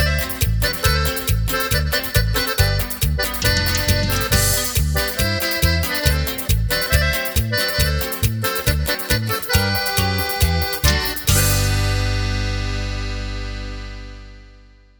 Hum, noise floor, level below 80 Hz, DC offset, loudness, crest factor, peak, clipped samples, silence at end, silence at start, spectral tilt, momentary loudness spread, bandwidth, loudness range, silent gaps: 50 Hz at -45 dBFS; -46 dBFS; -24 dBFS; under 0.1%; -19 LUFS; 18 dB; -2 dBFS; under 0.1%; 0.4 s; 0 s; -3.5 dB/octave; 8 LU; over 20 kHz; 2 LU; none